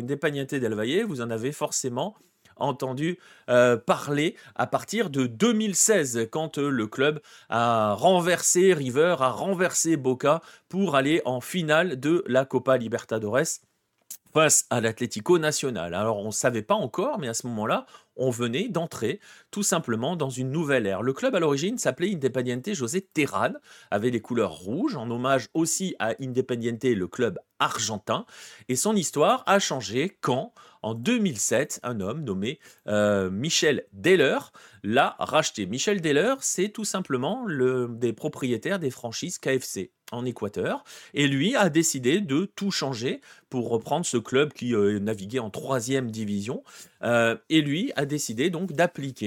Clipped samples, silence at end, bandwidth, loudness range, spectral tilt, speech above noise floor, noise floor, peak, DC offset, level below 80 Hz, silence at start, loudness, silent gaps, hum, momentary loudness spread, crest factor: under 0.1%; 0 s; 18 kHz; 5 LU; -4 dB/octave; 22 dB; -47 dBFS; -6 dBFS; under 0.1%; -70 dBFS; 0 s; -25 LUFS; none; none; 10 LU; 20 dB